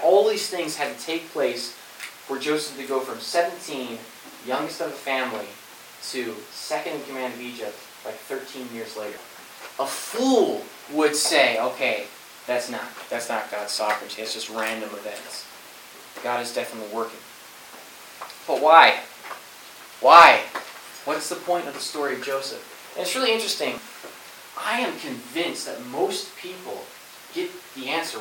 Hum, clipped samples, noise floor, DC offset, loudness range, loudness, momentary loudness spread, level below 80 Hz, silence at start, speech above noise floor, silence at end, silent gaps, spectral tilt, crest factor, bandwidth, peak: none; under 0.1%; -44 dBFS; under 0.1%; 15 LU; -23 LUFS; 21 LU; -72 dBFS; 0 s; 21 dB; 0 s; none; -1.5 dB/octave; 24 dB; 17.5 kHz; 0 dBFS